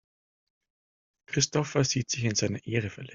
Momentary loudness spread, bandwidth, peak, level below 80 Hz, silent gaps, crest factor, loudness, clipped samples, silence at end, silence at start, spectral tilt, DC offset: 5 LU; 7.6 kHz; -10 dBFS; -62 dBFS; none; 20 dB; -28 LUFS; under 0.1%; 0 s; 1.3 s; -4 dB/octave; under 0.1%